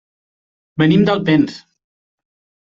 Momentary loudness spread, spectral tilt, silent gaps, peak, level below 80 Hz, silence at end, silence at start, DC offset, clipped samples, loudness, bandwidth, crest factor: 9 LU; -8 dB/octave; none; -2 dBFS; -52 dBFS; 1.1 s; 0.75 s; under 0.1%; under 0.1%; -15 LUFS; 7.4 kHz; 16 dB